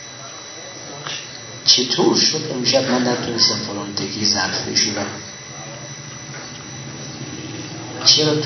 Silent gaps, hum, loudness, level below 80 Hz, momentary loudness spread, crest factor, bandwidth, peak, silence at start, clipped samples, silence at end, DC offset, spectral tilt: none; none; -17 LUFS; -60 dBFS; 19 LU; 20 dB; 6.4 kHz; 0 dBFS; 0 s; under 0.1%; 0 s; under 0.1%; -2.5 dB/octave